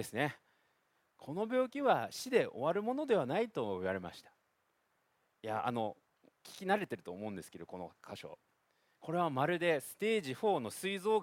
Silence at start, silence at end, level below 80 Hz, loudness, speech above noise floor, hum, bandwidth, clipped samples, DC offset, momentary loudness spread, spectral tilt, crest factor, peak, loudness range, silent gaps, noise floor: 0 s; 0 s; -80 dBFS; -36 LUFS; 43 dB; none; 16.5 kHz; under 0.1%; under 0.1%; 16 LU; -5 dB/octave; 22 dB; -16 dBFS; 7 LU; none; -79 dBFS